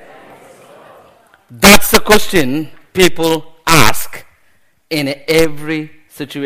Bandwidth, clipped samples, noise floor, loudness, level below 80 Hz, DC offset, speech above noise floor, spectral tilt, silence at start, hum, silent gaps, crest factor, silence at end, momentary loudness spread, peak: over 20 kHz; 0.6%; -56 dBFS; -12 LUFS; -32 dBFS; under 0.1%; 46 dB; -3.5 dB/octave; 0 s; none; none; 14 dB; 0 s; 17 LU; 0 dBFS